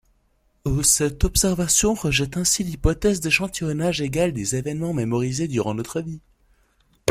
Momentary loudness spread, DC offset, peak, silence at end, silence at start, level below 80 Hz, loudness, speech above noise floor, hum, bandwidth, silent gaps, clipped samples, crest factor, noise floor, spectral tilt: 10 LU; under 0.1%; -2 dBFS; 0 s; 0.65 s; -34 dBFS; -21 LUFS; 42 dB; none; 16.5 kHz; none; under 0.1%; 22 dB; -64 dBFS; -3.5 dB/octave